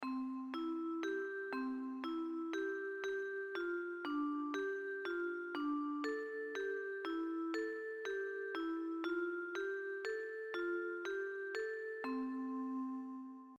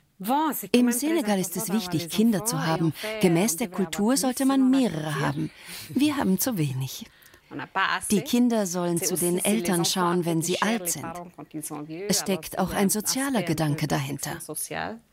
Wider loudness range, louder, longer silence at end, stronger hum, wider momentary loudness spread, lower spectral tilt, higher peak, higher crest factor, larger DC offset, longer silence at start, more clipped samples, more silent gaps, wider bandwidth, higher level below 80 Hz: about the same, 1 LU vs 3 LU; second, -42 LUFS vs -25 LUFS; about the same, 0.05 s vs 0.15 s; neither; second, 3 LU vs 11 LU; about the same, -3.5 dB/octave vs -4.5 dB/octave; second, -26 dBFS vs -6 dBFS; about the same, 16 dB vs 20 dB; neither; second, 0 s vs 0.2 s; neither; neither; second, 7.8 kHz vs 16.5 kHz; second, -82 dBFS vs -58 dBFS